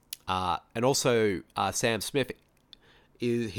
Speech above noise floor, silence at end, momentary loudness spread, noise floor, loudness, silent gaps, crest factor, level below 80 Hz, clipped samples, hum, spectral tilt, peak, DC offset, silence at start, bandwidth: 30 dB; 0 s; 9 LU; -58 dBFS; -29 LUFS; none; 18 dB; -60 dBFS; under 0.1%; none; -4 dB/octave; -12 dBFS; under 0.1%; 0.1 s; 19 kHz